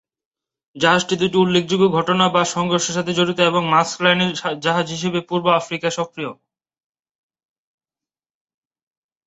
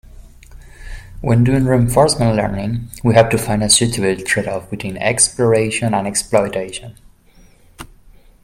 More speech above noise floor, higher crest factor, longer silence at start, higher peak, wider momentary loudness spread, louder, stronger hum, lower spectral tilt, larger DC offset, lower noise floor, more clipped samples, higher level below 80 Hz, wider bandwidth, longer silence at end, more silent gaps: first, over 72 dB vs 32 dB; about the same, 20 dB vs 18 dB; first, 0.75 s vs 0.15 s; about the same, -2 dBFS vs 0 dBFS; second, 7 LU vs 13 LU; second, -18 LUFS vs -15 LUFS; neither; about the same, -4 dB/octave vs -4.5 dB/octave; neither; first, under -90 dBFS vs -47 dBFS; neither; second, -60 dBFS vs -36 dBFS; second, 8.2 kHz vs 16 kHz; first, 2.95 s vs 0.6 s; neither